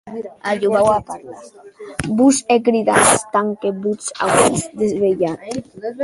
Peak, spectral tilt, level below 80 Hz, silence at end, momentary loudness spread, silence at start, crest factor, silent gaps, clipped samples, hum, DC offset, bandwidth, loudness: 0 dBFS; -4 dB/octave; -48 dBFS; 0 s; 16 LU; 0.05 s; 18 dB; none; under 0.1%; none; under 0.1%; 12 kHz; -17 LUFS